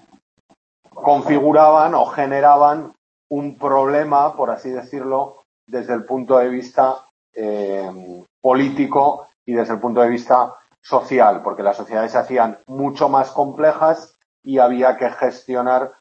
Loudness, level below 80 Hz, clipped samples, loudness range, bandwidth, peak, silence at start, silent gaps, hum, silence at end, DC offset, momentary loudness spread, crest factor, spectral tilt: -17 LUFS; -68 dBFS; under 0.1%; 6 LU; 7.8 kHz; 0 dBFS; 0.95 s; 2.98-3.30 s, 5.45-5.67 s, 7.11-7.33 s, 8.30-8.42 s, 9.35-9.46 s, 10.78-10.82 s, 14.25-14.43 s; none; 0.1 s; under 0.1%; 13 LU; 18 dB; -7 dB/octave